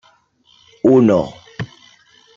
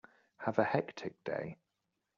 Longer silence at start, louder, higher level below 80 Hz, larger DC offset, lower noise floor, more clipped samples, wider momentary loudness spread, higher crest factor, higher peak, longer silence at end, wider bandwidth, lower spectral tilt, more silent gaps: first, 0.85 s vs 0.4 s; first, -14 LUFS vs -37 LUFS; first, -54 dBFS vs -76 dBFS; neither; second, -55 dBFS vs -85 dBFS; neither; first, 19 LU vs 11 LU; second, 16 dB vs 24 dB; first, -2 dBFS vs -14 dBFS; about the same, 0.7 s vs 0.65 s; about the same, 7.4 kHz vs 7.4 kHz; first, -8 dB/octave vs -5.5 dB/octave; neither